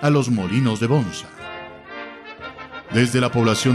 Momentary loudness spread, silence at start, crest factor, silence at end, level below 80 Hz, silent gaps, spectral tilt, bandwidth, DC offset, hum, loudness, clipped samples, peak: 17 LU; 0 s; 16 dB; 0 s; -50 dBFS; none; -5.5 dB/octave; 14 kHz; under 0.1%; none; -20 LUFS; under 0.1%; -6 dBFS